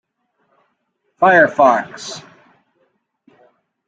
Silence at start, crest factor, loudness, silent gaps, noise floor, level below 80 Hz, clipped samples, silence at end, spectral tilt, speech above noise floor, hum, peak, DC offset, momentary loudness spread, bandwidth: 1.2 s; 18 dB; -13 LUFS; none; -69 dBFS; -64 dBFS; under 0.1%; 1.7 s; -4.5 dB/octave; 55 dB; none; 0 dBFS; under 0.1%; 19 LU; 9 kHz